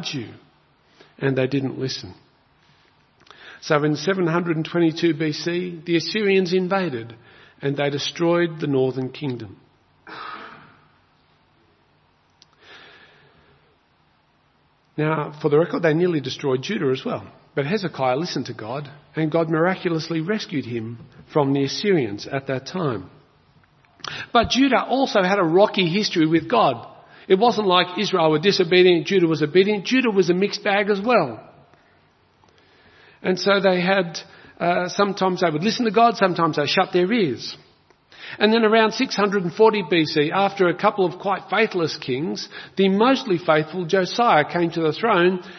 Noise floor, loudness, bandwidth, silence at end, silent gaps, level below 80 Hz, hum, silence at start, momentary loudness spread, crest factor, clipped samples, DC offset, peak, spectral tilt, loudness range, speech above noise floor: -61 dBFS; -20 LUFS; 6.4 kHz; 0 s; none; -60 dBFS; none; 0 s; 13 LU; 20 dB; under 0.1%; under 0.1%; 0 dBFS; -5.5 dB/octave; 7 LU; 41 dB